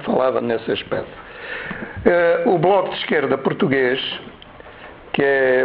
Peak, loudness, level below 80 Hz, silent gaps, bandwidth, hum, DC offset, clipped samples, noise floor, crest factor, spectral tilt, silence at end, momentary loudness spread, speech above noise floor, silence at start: 0 dBFS; -19 LUFS; -50 dBFS; none; 5.2 kHz; none; under 0.1%; under 0.1%; -40 dBFS; 18 dB; -9.5 dB/octave; 0 s; 19 LU; 22 dB; 0 s